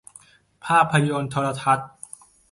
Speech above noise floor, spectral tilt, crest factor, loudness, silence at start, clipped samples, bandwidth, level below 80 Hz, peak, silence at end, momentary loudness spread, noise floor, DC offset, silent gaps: 31 dB; -5.5 dB/octave; 20 dB; -21 LUFS; 0.65 s; under 0.1%; 11.5 kHz; -60 dBFS; -4 dBFS; 0.65 s; 21 LU; -52 dBFS; under 0.1%; none